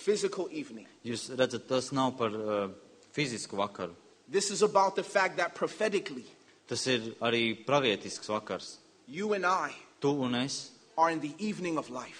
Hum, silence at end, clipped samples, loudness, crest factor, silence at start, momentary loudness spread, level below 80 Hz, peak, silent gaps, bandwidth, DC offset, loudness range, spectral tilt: none; 0 s; under 0.1%; -32 LUFS; 22 dB; 0 s; 12 LU; -74 dBFS; -12 dBFS; none; 10.5 kHz; under 0.1%; 3 LU; -4 dB/octave